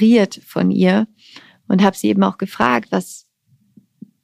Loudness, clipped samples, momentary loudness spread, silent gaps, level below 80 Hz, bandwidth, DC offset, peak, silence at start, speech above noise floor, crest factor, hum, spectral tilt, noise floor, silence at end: -17 LUFS; under 0.1%; 9 LU; none; -62 dBFS; 15 kHz; under 0.1%; 0 dBFS; 0 s; 43 dB; 18 dB; none; -6.5 dB/octave; -59 dBFS; 1.05 s